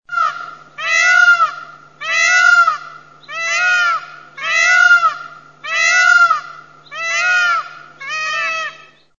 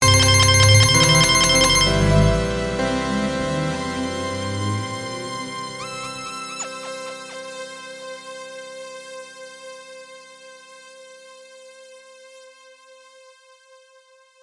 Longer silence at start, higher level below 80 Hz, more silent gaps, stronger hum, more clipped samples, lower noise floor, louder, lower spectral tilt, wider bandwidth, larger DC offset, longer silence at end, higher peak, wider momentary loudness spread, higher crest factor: about the same, 0.1 s vs 0 s; second, -70 dBFS vs -36 dBFS; neither; neither; neither; second, -39 dBFS vs -53 dBFS; first, -13 LUFS vs -18 LUFS; second, 2 dB/octave vs -3.5 dB/octave; second, 7.4 kHz vs 11.5 kHz; first, 0.2% vs under 0.1%; second, 0.45 s vs 2.05 s; about the same, 0 dBFS vs -2 dBFS; second, 20 LU vs 24 LU; second, 14 dB vs 20 dB